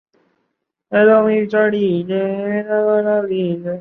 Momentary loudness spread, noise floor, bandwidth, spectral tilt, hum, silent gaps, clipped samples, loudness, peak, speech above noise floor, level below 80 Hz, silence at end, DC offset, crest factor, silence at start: 8 LU; -72 dBFS; 4.3 kHz; -9.5 dB/octave; none; none; under 0.1%; -16 LUFS; -2 dBFS; 57 dB; -62 dBFS; 0 s; under 0.1%; 14 dB; 0.9 s